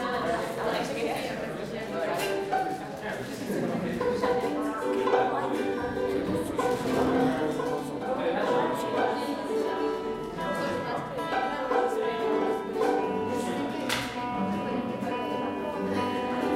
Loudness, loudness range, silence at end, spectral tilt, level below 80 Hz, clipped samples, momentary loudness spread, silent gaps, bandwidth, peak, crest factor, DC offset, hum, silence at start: -29 LUFS; 3 LU; 0 s; -5.5 dB/octave; -56 dBFS; under 0.1%; 6 LU; none; 16 kHz; -12 dBFS; 16 dB; under 0.1%; none; 0 s